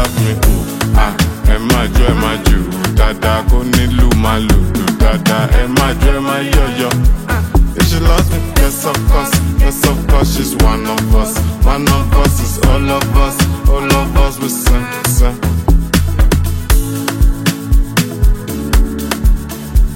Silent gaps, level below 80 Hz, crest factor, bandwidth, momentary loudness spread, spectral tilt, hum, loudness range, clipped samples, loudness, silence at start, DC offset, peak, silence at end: none; -12 dBFS; 10 dB; 16.5 kHz; 4 LU; -5 dB/octave; none; 2 LU; under 0.1%; -13 LUFS; 0 s; under 0.1%; 0 dBFS; 0 s